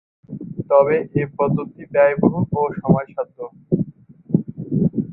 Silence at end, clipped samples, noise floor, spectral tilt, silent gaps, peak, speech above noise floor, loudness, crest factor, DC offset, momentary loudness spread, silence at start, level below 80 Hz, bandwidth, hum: 0 s; under 0.1%; -40 dBFS; -13.5 dB/octave; none; -2 dBFS; 22 dB; -20 LUFS; 18 dB; under 0.1%; 15 LU; 0.3 s; -50 dBFS; 3.5 kHz; none